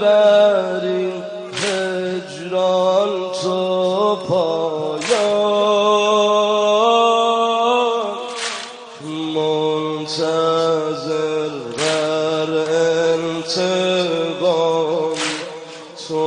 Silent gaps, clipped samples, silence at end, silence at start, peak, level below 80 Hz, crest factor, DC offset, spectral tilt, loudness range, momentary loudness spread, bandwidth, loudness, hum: none; under 0.1%; 0 s; 0 s; -2 dBFS; -66 dBFS; 14 dB; under 0.1%; -4 dB/octave; 4 LU; 10 LU; 10 kHz; -18 LUFS; none